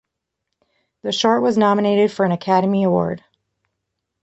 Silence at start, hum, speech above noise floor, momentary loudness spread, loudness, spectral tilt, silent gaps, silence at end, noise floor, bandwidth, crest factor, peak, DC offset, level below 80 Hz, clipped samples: 1.05 s; none; 62 dB; 9 LU; -18 LUFS; -6 dB/octave; none; 1.05 s; -79 dBFS; 8.2 kHz; 18 dB; -2 dBFS; under 0.1%; -60 dBFS; under 0.1%